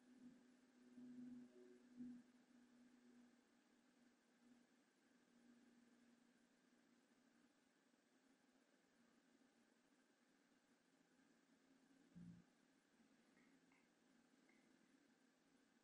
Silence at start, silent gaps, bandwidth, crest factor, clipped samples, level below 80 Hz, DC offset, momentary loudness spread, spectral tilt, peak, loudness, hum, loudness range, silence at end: 0 s; none; 10.5 kHz; 22 dB; under 0.1%; under -90 dBFS; under 0.1%; 8 LU; -5.5 dB/octave; -48 dBFS; -64 LUFS; none; 3 LU; 0 s